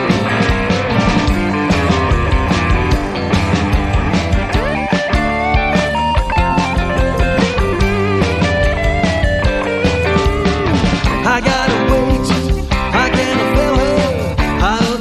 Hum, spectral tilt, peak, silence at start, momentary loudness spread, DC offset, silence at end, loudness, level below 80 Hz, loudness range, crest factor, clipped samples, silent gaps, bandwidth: none; -6 dB/octave; 0 dBFS; 0 s; 2 LU; under 0.1%; 0 s; -15 LUFS; -20 dBFS; 1 LU; 14 dB; under 0.1%; none; 13.5 kHz